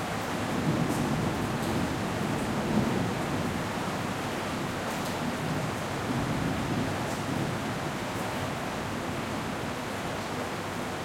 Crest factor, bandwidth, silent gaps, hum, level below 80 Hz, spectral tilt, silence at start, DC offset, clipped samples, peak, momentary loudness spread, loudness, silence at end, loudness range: 16 dB; 16.5 kHz; none; none; -50 dBFS; -5 dB/octave; 0 s; under 0.1%; under 0.1%; -14 dBFS; 5 LU; -31 LUFS; 0 s; 3 LU